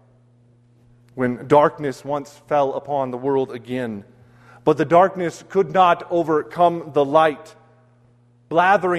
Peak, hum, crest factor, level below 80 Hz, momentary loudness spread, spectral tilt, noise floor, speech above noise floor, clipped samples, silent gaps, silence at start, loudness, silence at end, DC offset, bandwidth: -2 dBFS; none; 18 dB; -62 dBFS; 12 LU; -6.5 dB/octave; -55 dBFS; 36 dB; under 0.1%; none; 1.15 s; -20 LUFS; 0 s; under 0.1%; 12.5 kHz